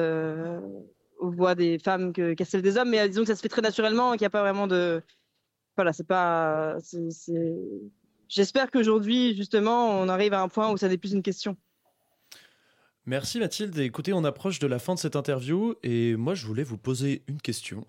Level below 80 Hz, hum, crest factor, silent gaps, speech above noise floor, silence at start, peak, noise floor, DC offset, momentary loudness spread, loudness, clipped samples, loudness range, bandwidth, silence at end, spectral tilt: -70 dBFS; none; 16 dB; none; 53 dB; 0 s; -10 dBFS; -78 dBFS; under 0.1%; 10 LU; -27 LUFS; under 0.1%; 6 LU; 16.5 kHz; 0.05 s; -5.5 dB/octave